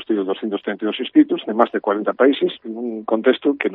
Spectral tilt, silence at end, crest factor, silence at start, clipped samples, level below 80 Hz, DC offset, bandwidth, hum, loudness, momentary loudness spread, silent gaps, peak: -8.5 dB/octave; 0 s; 18 dB; 0 s; under 0.1%; -72 dBFS; under 0.1%; 4.1 kHz; none; -19 LUFS; 8 LU; none; 0 dBFS